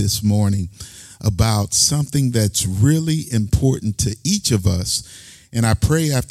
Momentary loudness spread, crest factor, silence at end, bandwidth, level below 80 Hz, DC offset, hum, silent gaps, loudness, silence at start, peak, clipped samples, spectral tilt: 9 LU; 16 dB; 0.05 s; 15.5 kHz; -36 dBFS; under 0.1%; none; none; -18 LUFS; 0 s; -2 dBFS; under 0.1%; -4.5 dB/octave